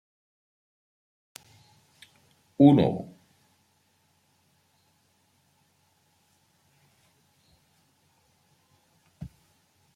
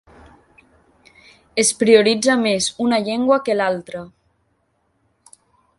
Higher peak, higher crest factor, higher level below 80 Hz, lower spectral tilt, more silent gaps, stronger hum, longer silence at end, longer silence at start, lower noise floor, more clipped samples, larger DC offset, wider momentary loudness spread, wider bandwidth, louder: second, -4 dBFS vs 0 dBFS; first, 28 dB vs 20 dB; second, -66 dBFS vs -60 dBFS; first, -8.5 dB/octave vs -3 dB/octave; neither; neither; second, 0.7 s vs 1.7 s; first, 2.6 s vs 1.55 s; about the same, -68 dBFS vs -66 dBFS; neither; neither; first, 32 LU vs 14 LU; about the same, 11.5 kHz vs 11.5 kHz; second, -21 LUFS vs -17 LUFS